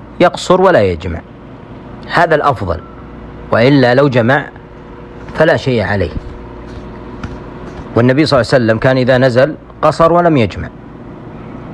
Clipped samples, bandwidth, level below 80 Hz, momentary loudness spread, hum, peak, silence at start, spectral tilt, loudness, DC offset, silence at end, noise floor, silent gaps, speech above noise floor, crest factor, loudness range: under 0.1%; 11 kHz; -34 dBFS; 22 LU; none; 0 dBFS; 0 s; -7 dB/octave; -11 LUFS; under 0.1%; 0 s; -32 dBFS; none; 21 dB; 14 dB; 5 LU